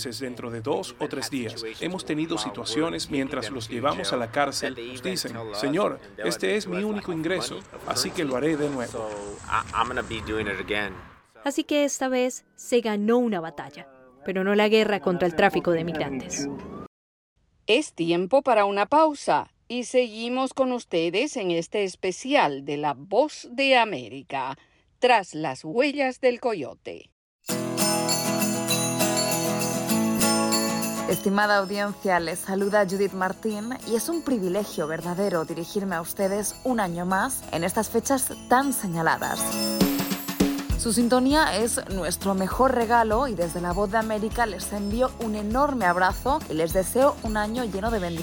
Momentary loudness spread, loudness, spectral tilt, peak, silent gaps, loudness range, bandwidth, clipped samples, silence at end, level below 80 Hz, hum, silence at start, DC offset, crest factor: 10 LU; -25 LUFS; -4 dB/octave; -6 dBFS; 16.87-17.36 s, 27.12-27.39 s; 4 LU; over 20 kHz; under 0.1%; 0 s; -46 dBFS; none; 0 s; under 0.1%; 18 dB